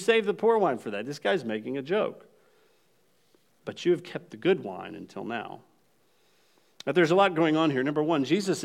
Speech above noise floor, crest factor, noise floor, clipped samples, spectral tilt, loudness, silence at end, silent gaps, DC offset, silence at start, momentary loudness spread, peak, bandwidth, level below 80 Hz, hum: 42 dB; 20 dB; -68 dBFS; under 0.1%; -5.5 dB/octave; -27 LUFS; 0 s; none; under 0.1%; 0 s; 17 LU; -8 dBFS; 13.5 kHz; -84 dBFS; none